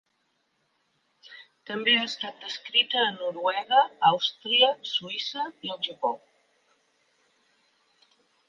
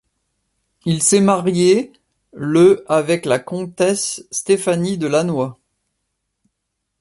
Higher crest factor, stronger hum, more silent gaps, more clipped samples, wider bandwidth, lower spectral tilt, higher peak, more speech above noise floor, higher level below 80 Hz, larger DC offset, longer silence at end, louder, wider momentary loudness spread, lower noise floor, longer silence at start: first, 22 dB vs 16 dB; neither; neither; neither; second, 7.4 kHz vs 11.5 kHz; second, -3 dB/octave vs -5 dB/octave; second, -6 dBFS vs -2 dBFS; second, 47 dB vs 59 dB; second, -86 dBFS vs -58 dBFS; neither; first, 2.3 s vs 1.45 s; second, -25 LUFS vs -17 LUFS; about the same, 13 LU vs 12 LU; about the same, -74 dBFS vs -76 dBFS; first, 1.3 s vs 0.85 s